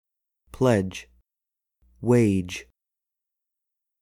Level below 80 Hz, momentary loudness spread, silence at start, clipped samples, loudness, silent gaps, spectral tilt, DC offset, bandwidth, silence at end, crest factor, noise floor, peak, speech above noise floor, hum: -56 dBFS; 16 LU; 0.6 s; under 0.1%; -24 LUFS; none; -7 dB/octave; under 0.1%; 14.5 kHz; 1.4 s; 22 dB; -87 dBFS; -6 dBFS; 65 dB; none